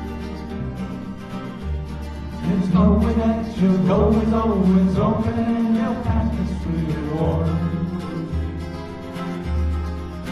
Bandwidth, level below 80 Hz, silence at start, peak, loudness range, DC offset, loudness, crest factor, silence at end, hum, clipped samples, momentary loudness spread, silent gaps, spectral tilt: 11 kHz; -32 dBFS; 0 s; -6 dBFS; 6 LU; under 0.1%; -22 LUFS; 16 dB; 0 s; none; under 0.1%; 14 LU; none; -9 dB/octave